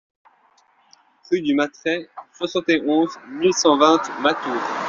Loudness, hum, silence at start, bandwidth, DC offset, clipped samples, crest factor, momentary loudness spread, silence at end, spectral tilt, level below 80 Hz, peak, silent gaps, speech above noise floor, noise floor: -20 LUFS; none; 1.3 s; 7.6 kHz; under 0.1%; under 0.1%; 18 dB; 10 LU; 0 s; -2.5 dB/octave; -64 dBFS; -2 dBFS; none; 39 dB; -59 dBFS